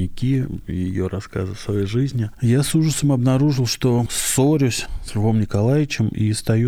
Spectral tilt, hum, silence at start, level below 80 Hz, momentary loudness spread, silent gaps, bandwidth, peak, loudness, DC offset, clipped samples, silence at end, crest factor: -5.5 dB/octave; none; 0 s; -38 dBFS; 9 LU; none; 17 kHz; -6 dBFS; -20 LUFS; under 0.1%; under 0.1%; 0 s; 14 dB